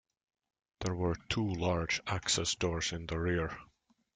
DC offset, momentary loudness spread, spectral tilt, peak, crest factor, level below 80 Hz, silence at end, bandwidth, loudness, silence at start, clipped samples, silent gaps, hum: under 0.1%; 8 LU; -4 dB/octave; -16 dBFS; 20 dB; -54 dBFS; 0.5 s; 9.6 kHz; -34 LUFS; 0.8 s; under 0.1%; none; none